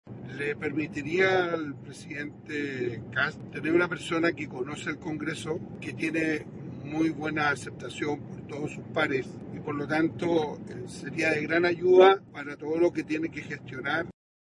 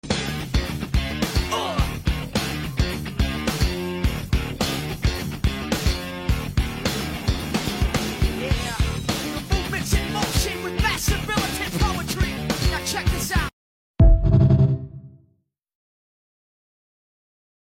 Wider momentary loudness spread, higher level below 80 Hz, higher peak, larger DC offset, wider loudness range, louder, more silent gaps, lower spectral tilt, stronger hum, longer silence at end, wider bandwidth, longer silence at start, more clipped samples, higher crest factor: first, 14 LU vs 7 LU; second, -64 dBFS vs -28 dBFS; about the same, -8 dBFS vs -6 dBFS; neither; about the same, 6 LU vs 4 LU; second, -28 LUFS vs -23 LUFS; second, none vs 13.53-13.94 s; about the same, -6 dB/octave vs -5 dB/octave; neither; second, 0.3 s vs 2.45 s; second, 11.5 kHz vs 16.5 kHz; about the same, 0.05 s vs 0.05 s; neither; first, 22 dB vs 16 dB